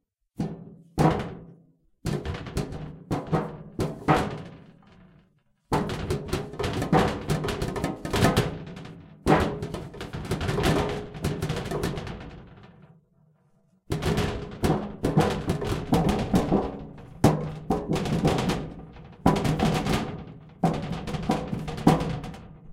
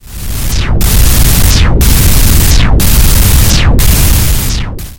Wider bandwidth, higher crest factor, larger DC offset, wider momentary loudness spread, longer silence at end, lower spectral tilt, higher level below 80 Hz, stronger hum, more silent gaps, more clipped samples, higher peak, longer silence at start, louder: second, 16.5 kHz vs over 20 kHz; first, 24 dB vs 6 dB; neither; first, 16 LU vs 7 LU; about the same, 0 s vs 0.05 s; first, -6.5 dB/octave vs -4 dB/octave; second, -40 dBFS vs -8 dBFS; neither; neither; second, under 0.1% vs 2%; second, -4 dBFS vs 0 dBFS; first, 0.4 s vs 0.05 s; second, -27 LUFS vs -8 LUFS